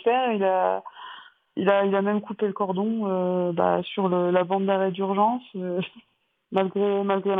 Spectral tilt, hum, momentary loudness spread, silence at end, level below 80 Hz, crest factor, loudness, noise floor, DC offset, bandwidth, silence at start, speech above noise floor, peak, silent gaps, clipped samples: -9.5 dB/octave; none; 9 LU; 0 s; -76 dBFS; 18 dB; -24 LUFS; -46 dBFS; under 0.1%; 3.9 kHz; 0.05 s; 22 dB; -8 dBFS; none; under 0.1%